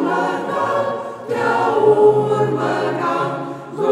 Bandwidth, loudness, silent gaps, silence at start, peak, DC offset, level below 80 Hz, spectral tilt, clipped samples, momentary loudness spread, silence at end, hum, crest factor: 11.5 kHz; -18 LUFS; none; 0 s; -2 dBFS; under 0.1%; -66 dBFS; -6.5 dB/octave; under 0.1%; 11 LU; 0 s; none; 14 dB